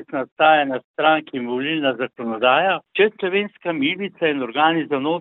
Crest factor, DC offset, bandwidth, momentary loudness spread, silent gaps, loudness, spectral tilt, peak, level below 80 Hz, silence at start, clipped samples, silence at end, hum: 18 dB; under 0.1%; 4.1 kHz; 9 LU; 0.32-0.36 s, 0.84-0.94 s; -20 LUFS; -9 dB/octave; -2 dBFS; -70 dBFS; 0 s; under 0.1%; 0 s; none